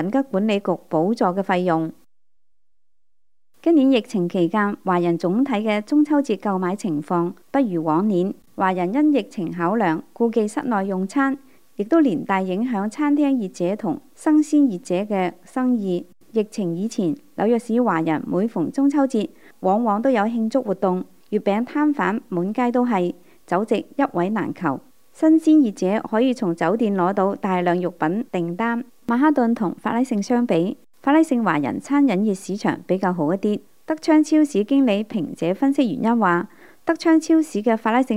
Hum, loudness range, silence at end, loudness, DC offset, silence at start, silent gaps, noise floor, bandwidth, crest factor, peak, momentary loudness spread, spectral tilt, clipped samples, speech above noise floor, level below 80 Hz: none; 3 LU; 0 s; -21 LUFS; 0.3%; 0 s; none; -82 dBFS; 12 kHz; 16 dB; -4 dBFS; 8 LU; -7 dB/octave; under 0.1%; 62 dB; -70 dBFS